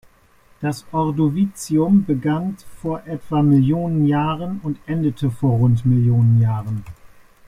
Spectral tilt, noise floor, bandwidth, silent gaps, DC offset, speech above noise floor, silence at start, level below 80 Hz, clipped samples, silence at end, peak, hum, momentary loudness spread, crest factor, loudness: -8.5 dB/octave; -54 dBFS; 13 kHz; none; under 0.1%; 36 dB; 0.6 s; -48 dBFS; under 0.1%; 0.4 s; -6 dBFS; none; 12 LU; 14 dB; -19 LUFS